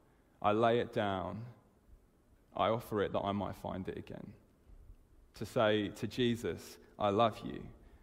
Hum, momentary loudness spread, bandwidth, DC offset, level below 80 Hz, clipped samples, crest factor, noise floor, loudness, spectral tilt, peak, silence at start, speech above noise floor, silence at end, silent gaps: none; 18 LU; 16 kHz; under 0.1%; -62 dBFS; under 0.1%; 20 dB; -67 dBFS; -35 LUFS; -6 dB/octave; -16 dBFS; 0.4 s; 32 dB; 0.05 s; none